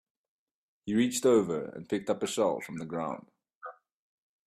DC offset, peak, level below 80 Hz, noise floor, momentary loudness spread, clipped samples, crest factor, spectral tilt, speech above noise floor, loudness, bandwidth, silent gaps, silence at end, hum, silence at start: under 0.1%; -12 dBFS; -70 dBFS; -49 dBFS; 22 LU; under 0.1%; 20 dB; -4.5 dB/octave; 20 dB; -30 LUFS; 15 kHz; 3.55-3.61 s; 0.75 s; none; 0.85 s